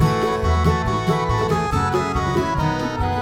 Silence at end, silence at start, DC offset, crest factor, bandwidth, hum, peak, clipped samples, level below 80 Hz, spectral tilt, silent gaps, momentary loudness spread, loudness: 0 s; 0 s; 0.2%; 14 dB; 16.5 kHz; none; -6 dBFS; under 0.1%; -30 dBFS; -6.5 dB/octave; none; 3 LU; -20 LUFS